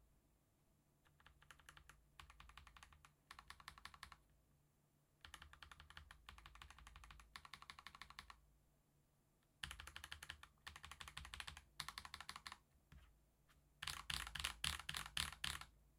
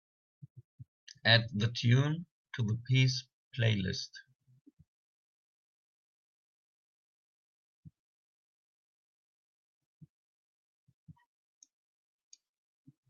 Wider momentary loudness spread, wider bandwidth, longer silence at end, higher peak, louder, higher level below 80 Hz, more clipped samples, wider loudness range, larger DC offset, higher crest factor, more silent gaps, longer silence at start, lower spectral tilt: about the same, 20 LU vs 19 LU; first, 16.5 kHz vs 7 kHz; second, 0 s vs 5.2 s; second, -20 dBFS vs -10 dBFS; second, -52 LUFS vs -31 LUFS; about the same, -68 dBFS vs -72 dBFS; neither; first, 14 LU vs 9 LU; neither; first, 36 dB vs 28 dB; second, none vs 0.64-0.78 s, 0.88-1.07 s, 2.31-2.45 s, 3.33-3.51 s, 4.35-4.39 s, 4.61-4.65 s, 4.73-4.77 s, 4.87-7.83 s; second, 0 s vs 0.55 s; second, -1 dB/octave vs -4 dB/octave